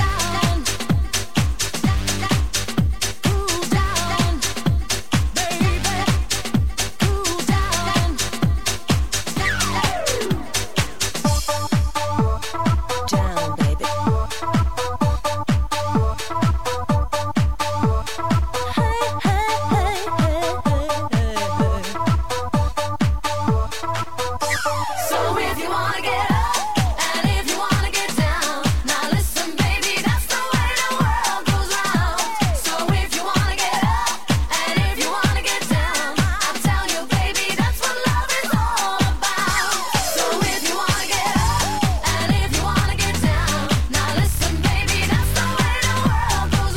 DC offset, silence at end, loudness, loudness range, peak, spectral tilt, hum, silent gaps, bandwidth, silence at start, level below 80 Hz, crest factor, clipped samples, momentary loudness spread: 4%; 0 s; -20 LUFS; 2 LU; -6 dBFS; -4 dB/octave; none; none; 16.5 kHz; 0 s; -28 dBFS; 14 dB; under 0.1%; 3 LU